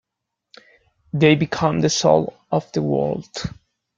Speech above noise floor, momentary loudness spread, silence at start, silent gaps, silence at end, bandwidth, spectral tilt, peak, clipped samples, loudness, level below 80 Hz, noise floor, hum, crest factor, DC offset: 62 dB; 14 LU; 1.15 s; none; 0.5 s; 7.6 kHz; -5.5 dB/octave; -2 dBFS; under 0.1%; -20 LUFS; -52 dBFS; -81 dBFS; none; 20 dB; under 0.1%